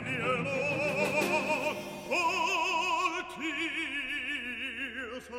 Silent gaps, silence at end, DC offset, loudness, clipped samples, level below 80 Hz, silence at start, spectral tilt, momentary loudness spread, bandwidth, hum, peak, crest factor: none; 0 s; under 0.1%; -31 LUFS; under 0.1%; -62 dBFS; 0 s; -3.5 dB/octave; 7 LU; 16 kHz; none; -16 dBFS; 16 dB